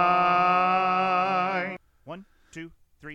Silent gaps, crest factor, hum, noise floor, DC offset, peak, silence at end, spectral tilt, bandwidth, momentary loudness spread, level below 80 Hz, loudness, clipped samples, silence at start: none; 16 dB; none; -43 dBFS; under 0.1%; -10 dBFS; 0 s; -6 dB/octave; 8.4 kHz; 22 LU; -62 dBFS; -23 LUFS; under 0.1%; 0 s